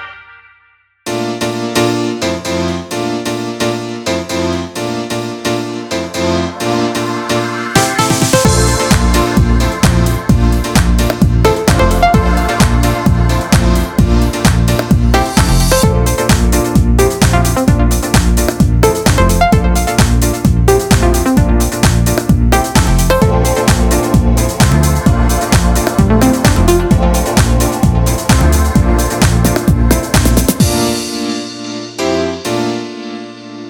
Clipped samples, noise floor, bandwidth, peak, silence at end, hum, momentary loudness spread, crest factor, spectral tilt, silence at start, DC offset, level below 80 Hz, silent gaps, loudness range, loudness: under 0.1%; -51 dBFS; 19 kHz; 0 dBFS; 0 s; none; 8 LU; 12 dB; -5 dB/octave; 0 s; under 0.1%; -16 dBFS; none; 6 LU; -12 LUFS